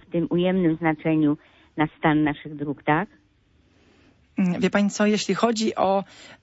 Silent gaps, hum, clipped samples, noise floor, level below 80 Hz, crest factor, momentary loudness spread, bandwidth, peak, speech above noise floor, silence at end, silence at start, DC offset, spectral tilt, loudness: none; none; under 0.1%; -61 dBFS; -56 dBFS; 18 dB; 11 LU; 8 kHz; -6 dBFS; 39 dB; 0.1 s; 0.15 s; under 0.1%; -6 dB/octave; -23 LUFS